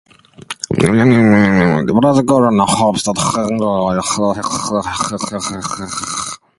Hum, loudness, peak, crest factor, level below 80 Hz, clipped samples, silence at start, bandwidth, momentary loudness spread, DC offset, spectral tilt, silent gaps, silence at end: none; -14 LUFS; 0 dBFS; 14 dB; -42 dBFS; under 0.1%; 0.4 s; 11.5 kHz; 11 LU; under 0.1%; -5 dB/octave; none; 0.2 s